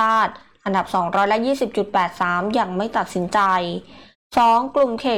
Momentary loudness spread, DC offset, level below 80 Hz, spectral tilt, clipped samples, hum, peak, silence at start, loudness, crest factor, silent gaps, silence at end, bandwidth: 7 LU; 0.2%; -56 dBFS; -5.5 dB/octave; under 0.1%; none; -8 dBFS; 0 s; -20 LUFS; 12 dB; 4.15-4.30 s; 0 s; 16.5 kHz